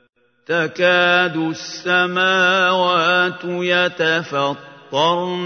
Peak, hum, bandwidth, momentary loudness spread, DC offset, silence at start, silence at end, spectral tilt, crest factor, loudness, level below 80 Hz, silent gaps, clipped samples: -2 dBFS; none; 6.6 kHz; 9 LU; under 0.1%; 0.5 s; 0 s; -4 dB/octave; 16 dB; -17 LUFS; -72 dBFS; none; under 0.1%